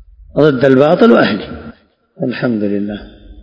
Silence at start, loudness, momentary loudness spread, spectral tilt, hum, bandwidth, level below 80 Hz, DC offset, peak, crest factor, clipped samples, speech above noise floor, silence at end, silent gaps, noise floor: 0.35 s; -12 LUFS; 17 LU; -8.5 dB/octave; none; 7 kHz; -42 dBFS; under 0.1%; 0 dBFS; 14 dB; 0.7%; 27 dB; 0 s; none; -39 dBFS